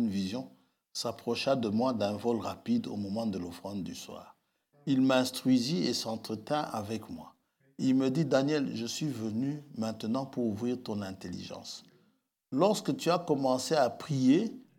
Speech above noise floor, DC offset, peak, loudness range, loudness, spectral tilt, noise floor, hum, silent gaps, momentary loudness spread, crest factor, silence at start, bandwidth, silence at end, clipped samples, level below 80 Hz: 42 dB; under 0.1%; -12 dBFS; 4 LU; -31 LUFS; -5.5 dB/octave; -72 dBFS; none; none; 14 LU; 20 dB; 0 s; 16.5 kHz; 0.2 s; under 0.1%; -78 dBFS